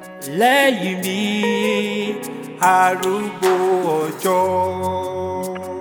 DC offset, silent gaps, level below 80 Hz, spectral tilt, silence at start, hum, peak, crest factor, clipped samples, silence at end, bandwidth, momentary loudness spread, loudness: under 0.1%; none; -62 dBFS; -4 dB/octave; 0 s; none; -2 dBFS; 16 dB; under 0.1%; 0 s; 19 kHz; 11 LU; -19 LUFS